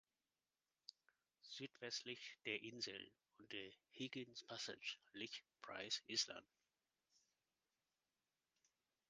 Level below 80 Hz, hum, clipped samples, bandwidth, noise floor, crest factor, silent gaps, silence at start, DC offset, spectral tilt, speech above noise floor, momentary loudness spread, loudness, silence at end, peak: under -90 dBFS; none; under 0.1%; 9.6 kHz; under -90 dBFS; 26 dB; none; 0.9 s; under 0.1%; -1.5 dB/octave; over 38 dB; 18 LU; -50 LUFS; 2.65 s; -28 dBFS